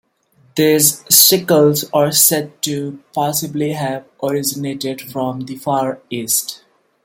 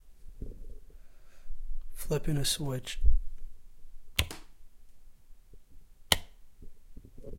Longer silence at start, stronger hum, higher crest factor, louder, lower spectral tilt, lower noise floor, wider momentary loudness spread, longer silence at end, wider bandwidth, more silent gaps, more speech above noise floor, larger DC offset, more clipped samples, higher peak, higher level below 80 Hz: first, 0.55 s vs 0.05 s; neither; second, 16 dB vs 28 dB; first, -15 LUFS vs -32 LUFS; about the same, -3 dB/octave vs -3.5 dB/octave; first, -55 dBFS vs -50 dBFS; second, 14 LU vs 25 LU; first, 0.5 s vs 0 s; about the same, 17 kHz vs 16.5 kHz; neither; first, 38 dB vs 25 dB; neither; neither; first, 0 dBFS vs -4 dBFS; second, -60 dBFS vs -36 dBFS